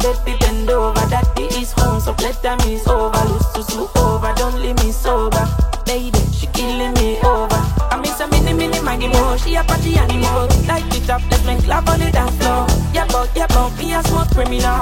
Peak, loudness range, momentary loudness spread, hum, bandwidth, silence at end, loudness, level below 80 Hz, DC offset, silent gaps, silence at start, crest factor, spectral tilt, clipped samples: 0 dBFS; 1 LU; 4 LU; none; 16.5 kHz; 0 s; -17 LUFS; -18 dBFS; 0.4%; none; 0 s; 14 dB; -5 dB/octave; under 0.1%